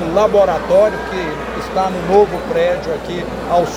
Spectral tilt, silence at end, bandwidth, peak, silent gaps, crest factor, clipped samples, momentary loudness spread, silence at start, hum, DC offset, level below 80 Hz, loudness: -5.5 dB/octave; 0 s; 15.5 kHz; 0 dBFS; none; 16 dB; under 0.1%; 9 LU; 0 s; none; under 0.1%; -36 dBFS; -16 LUFS